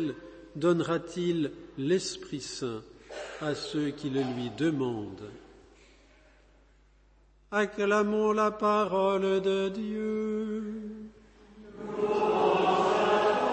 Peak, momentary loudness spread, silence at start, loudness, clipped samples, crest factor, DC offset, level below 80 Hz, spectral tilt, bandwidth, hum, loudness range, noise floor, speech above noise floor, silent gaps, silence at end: -12 dBFS; 17 LU; 0 s; -29 LUFS; under 0.1%; 16 dB; under 0.1%; -62 dBFS; -5.5 dB/octave; 8.8 kHz; none; 7 LU; -61 dBFS; 32 dB; none; 0 s